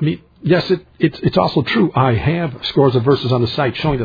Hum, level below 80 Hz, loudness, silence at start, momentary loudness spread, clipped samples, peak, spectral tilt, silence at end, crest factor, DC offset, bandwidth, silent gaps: none; -40 dBFS; -16 LUFS; 0 s; 5 LU; under 0.1%; 0 dBFS; -8.5 dB/octave; 0 s; 14 dB; under 0.1%; 5 kHz; none